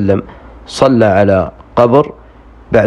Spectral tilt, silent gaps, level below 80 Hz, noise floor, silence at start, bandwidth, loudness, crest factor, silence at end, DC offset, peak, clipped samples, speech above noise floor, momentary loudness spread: -7 dB/octave; none; -38 dBFS; -38 dBFS; 0 s; 11.5 kHz; -12 LUFS; 12 dB; 0 s; under 0.1%; 0 dBFS; 0.3%; 27 dB; 9 LU